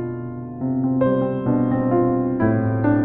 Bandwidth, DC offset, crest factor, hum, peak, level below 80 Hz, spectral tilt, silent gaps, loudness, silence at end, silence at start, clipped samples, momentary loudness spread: 3.4 kHz; under 0.1%; 14 dB; none; -6 dBFS; -46 dBFS; -10 dB/octave; none; -20 LUFS; 0 s; 0 s; under 0.1%; 9 LU